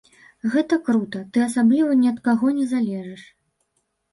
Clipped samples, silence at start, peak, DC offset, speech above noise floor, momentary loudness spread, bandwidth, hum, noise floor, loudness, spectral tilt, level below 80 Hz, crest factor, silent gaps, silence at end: under 0.1%; 0.45 s; -8 dBFS; under 0.1%; 52 dB; 9 LU; 11.5 kHz; none; -72 dBFS; -21 LUFS; -6 dB/octave; -66 dBFS; 14 dB; none; 0.9 s